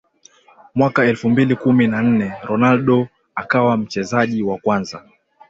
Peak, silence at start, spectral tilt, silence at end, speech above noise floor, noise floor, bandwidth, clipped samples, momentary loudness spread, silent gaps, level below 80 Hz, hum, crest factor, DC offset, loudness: -2 dBFS; 0.75 s; -7 dB/octave; 0.5 s; 34 dB; -51 dBFS; 7.6 kHz; under 0.1%; 9 LU; none; -54 dBFS; none; 14 dB; under 0.1%; -17 LUFS